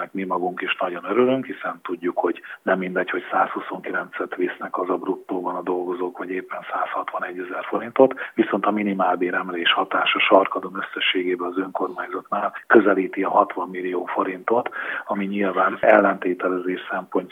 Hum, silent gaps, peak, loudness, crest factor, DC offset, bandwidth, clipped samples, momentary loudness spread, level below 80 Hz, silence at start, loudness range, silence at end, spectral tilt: none; none; 0 dBFS; -22 LUFS; 22 dB; under 0.1%; 3.9 kHz; under 0.1%; 12 LU; -76 dBFS; 0 s; 6 LU; 0 s; -7 dB/octave